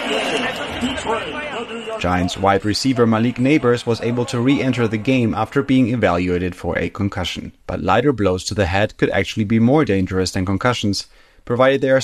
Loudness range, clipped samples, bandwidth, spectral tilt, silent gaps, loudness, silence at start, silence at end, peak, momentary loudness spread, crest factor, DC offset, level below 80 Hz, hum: 2 LU; under 0.1%; 13 kHz; -5.5 dB/octave; none; -18 LUFS; 0 s; 0 s; -2 dBFS; 9 LU; 16 dB; under 0.1%; -42 dBFS; none